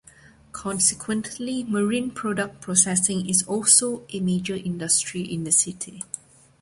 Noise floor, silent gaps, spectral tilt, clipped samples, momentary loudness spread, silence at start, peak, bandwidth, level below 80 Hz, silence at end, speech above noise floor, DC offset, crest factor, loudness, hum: -51 dBFS; none; -3 dB/octave; under 0.1%; 16 LU; 0.55 s; -2 dBFS; 12 kHz; -60 dBFS; 0.45 s; 28 dB; under 0.1%; 22 dB; -22 LUFS; none